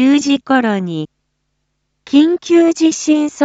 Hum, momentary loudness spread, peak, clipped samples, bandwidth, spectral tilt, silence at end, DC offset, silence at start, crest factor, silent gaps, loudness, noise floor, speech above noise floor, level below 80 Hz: none; 10 LU; 0 dBFS; under 0.1%; 8 kHz; -4.5 dB/octave; 0 s; under 0.1%; 0 s; 14 dB; none; -13 LUFS; -69 dBFS; 56 dB; -60 dBFS